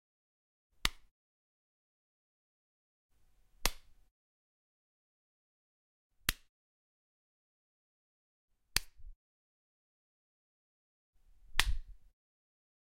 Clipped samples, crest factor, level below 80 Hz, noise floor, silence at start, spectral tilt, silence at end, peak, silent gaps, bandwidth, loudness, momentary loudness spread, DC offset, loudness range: under 0.1%; 40 dB; -50 dBFS; -67 dBFS; 0.85 s; -1 dB/octave; 1.05 s; -6 dBFS; 1.11-3.09 s, 4.11-6.10 s, 6.49-8.48 s, 9.16-11.13 s; 16 kHz; -37 LUFS; 6 LU; under 0.1%; 3 LU